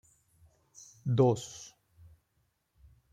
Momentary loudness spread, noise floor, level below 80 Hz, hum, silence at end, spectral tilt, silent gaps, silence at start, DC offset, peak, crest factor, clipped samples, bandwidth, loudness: 26 LU; -77 dBFS; -66 dBFS; none; 1.45 s; -7 dB/octave; none; 1.05 s; under 0.1%; -12 dBFS; 24 dB; under 0.1%; 12.5 kHz; -30 LUFS